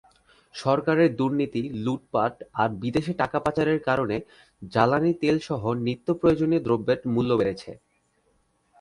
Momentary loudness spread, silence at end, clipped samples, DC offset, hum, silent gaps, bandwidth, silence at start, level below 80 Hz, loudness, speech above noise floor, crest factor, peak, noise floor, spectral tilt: 7 LU; 1.05 s; under 0.1%; under 0.1%; none; none; 11 kHz; 0.55 s; -54 dBFS; -25 LUFS; 44 dB; 20 dB; -4 dBFS; -68 dBFS; -7.5 dB/octave